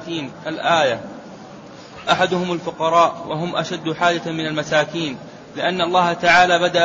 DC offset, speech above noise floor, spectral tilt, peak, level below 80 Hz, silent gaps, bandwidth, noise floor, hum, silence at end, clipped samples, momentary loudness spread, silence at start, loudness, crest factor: under 0.1%; 20 dB; -4 dB/octave; -2 dBFS; -58 dBFS; none; 8 kHz; -38 dBFS; none; 0 s; under 0.1%; 21 LU; 0 s; -19 LUFS; 16 dB